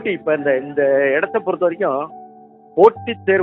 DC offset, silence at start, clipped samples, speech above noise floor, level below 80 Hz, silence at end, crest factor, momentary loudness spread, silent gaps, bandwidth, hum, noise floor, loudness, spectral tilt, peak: under 0.1%; 0 s; under 0.1%; 27 dB; -66 dBFS; 0 s; 18 dB; 10 LU; none; 4.2 kHz; none; -44 dBFS; -17 LUFS; -8 dB/octave; 0 dBFS